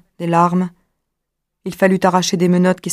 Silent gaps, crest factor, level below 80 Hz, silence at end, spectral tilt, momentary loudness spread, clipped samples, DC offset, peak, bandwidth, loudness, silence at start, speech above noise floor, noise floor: none; 16 dB; -58 dBFS; 0 s; -5.5 dB/octave; 12 LU; under 0.1%; under 0.1%; 0 dBFS; 15 kHz; -16 LUFS; 0.2 s; 61 dB; -76 dBFS